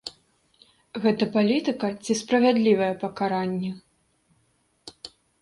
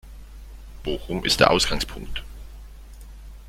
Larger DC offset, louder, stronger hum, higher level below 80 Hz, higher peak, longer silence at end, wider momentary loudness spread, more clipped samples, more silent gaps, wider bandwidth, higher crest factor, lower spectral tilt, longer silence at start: neither; about the same, -24 LUFS vs -22 LUFS; neither; second, -66 dBFS vs -38 dBFS; second, -8 dBFS vs -2 dBFS; first, 0.35 s vs 0 s; second, 21 LU vs 27 LU; neither; neither; second, 11.5 kHz vs 16.5 kHz; second, 18 dB vs 24 dB; first, -5.5 dB/octave vs -3.5 dB/octave; about the same, 0.05 s vs 0.05 s